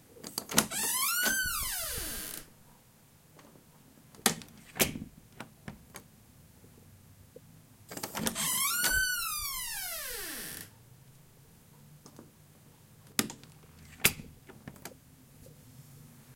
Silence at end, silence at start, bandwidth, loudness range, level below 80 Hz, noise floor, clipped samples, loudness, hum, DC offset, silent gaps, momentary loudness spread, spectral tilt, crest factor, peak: 0 s; 0.1 s; 16.5 kHz; 10 LU; -56 dBFS; -60 dBFS; under 0.1%; -31 LUFS; none; under 0.1%; none; 25 LU; -1 dB/octave; 36 dB; -2 dBFS